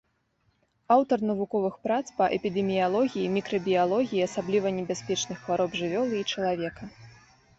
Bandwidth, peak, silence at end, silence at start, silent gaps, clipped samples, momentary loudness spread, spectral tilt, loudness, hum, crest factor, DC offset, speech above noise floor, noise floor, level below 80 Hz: 8 kHz; -8 dBFS; 0.5 s; 0.9 s; none; under 0.1%; 6 LU; -5 dB/octave; -27 LUFS; none; 18 dB; under 0.1%; 44 dB; -71 dBFS; -64 dBFS